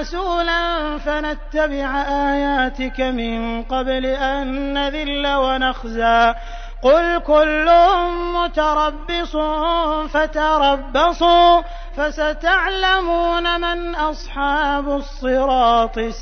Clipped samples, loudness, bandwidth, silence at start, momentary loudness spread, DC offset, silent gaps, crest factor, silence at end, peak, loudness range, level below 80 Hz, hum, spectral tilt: under 0.1%; -18 LUFS; 6.6 kHz; 0 s; 9 LU; 0.2%; none; 16 dB; 0 s; -2 dBFS; 5 LU; -30 dBFS; none; -4.5 dB/octave